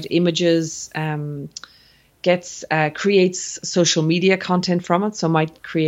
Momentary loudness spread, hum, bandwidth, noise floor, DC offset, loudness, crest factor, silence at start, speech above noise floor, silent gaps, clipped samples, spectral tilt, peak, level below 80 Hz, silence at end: 10 LU; none; 8.2 kHz; -54 dBFS; under 0.1%; -20 LUFS; 18 dB; 0 s; 34 dB; none; under 0.1%; -4.5 dB/octave; -2 dBFS; -62 dBFS; 0 s